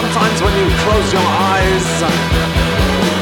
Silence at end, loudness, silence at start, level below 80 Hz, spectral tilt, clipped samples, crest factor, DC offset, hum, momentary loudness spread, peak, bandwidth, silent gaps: 0 s; -13 LUFS; 0 s; -22 dBFS; -4.5 dB/octave; under 0.1%; 10 dB; under 0.1%; none; 2 LU; -2 dBFS; 18 kHz; none